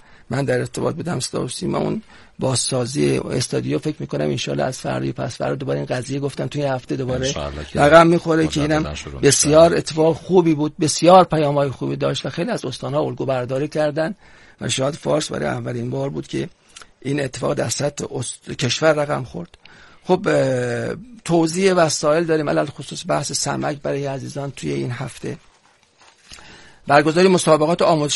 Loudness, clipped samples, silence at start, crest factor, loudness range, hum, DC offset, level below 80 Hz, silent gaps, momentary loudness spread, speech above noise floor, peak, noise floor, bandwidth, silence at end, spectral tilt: -19 LUFS; under 0.1%; 0.3 s; 20 dB; 9 LU; none; 0.2%; -48 dBFS; none; 14 LU; 37 dB; 0 dBFS; -56 dBFS; 11.5 kHz; 0 s; -5 dB/octave